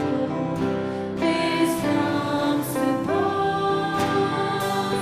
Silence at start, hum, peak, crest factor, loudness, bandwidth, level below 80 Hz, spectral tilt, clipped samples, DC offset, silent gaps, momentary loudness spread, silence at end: 0 s; none; -10 dBFS; 14 dB; -23 LUFS; 15.5 kHz; -56 dBFS; -5.5 dB/octave; under 0.1%; under 0.1%; none; 4 LU; 0 s